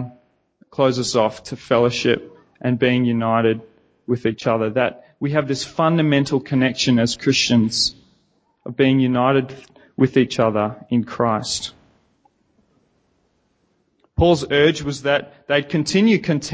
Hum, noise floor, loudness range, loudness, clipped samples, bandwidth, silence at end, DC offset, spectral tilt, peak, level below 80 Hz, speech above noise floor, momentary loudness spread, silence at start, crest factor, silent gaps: none; -65 dBFS; 5 LU; -19 LUFS; under 0.1%; 8 kHz; 0 s; under 0.1%; -5 dB/octave; -2 dBFS; -44 dBFS; 47 dB; 10 LU; 0 s; 18 dB; none